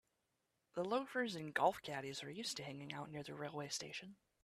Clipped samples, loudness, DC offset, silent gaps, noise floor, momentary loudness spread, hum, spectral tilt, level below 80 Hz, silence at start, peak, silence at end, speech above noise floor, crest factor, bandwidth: under 0.1%; -43 LUFS; under 0.1%; none; -86 dBFS; 12 LU; none; -3.5 dB/octave; -80 dBFS; 0.75 s; -22 dBFS; 0.3 s; 43 dB; 22 dB; 15 kHz